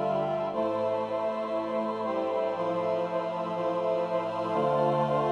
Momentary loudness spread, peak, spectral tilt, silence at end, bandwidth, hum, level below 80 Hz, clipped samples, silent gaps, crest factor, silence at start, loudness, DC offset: 5 LU; -14 dBFS; -7.5 dB/octave; 0 s; 9.6 kHz; none; -68 dBFS; under 0.1%; none; 14 dB; 0 s; -29 LUFS; under 0.1%